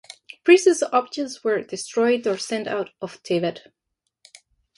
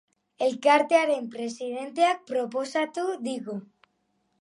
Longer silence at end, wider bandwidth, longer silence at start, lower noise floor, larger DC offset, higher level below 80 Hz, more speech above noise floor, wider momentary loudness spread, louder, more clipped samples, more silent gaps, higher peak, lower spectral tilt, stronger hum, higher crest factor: first, 1.2 s vs 0.8 s; about the same, 11.5 kHz vs 11.5 kHz; about the same, 0.45 s vs 0.4 s; second, -58 dBFS vs -73 dBFS; neither; first, -72 dBFS vs -84 dBFS; second, 37 dB vs 47 dB; about the same, 14 LU vs 13 LU; first, -22 LUFS vs -26 LUFS; neither; neither; first, -2 dBFS vs -6 dBFS; about the same, -4 dB/octave vs -3.5 dB/octave; neither; about the same, 20 dB vs 20 dB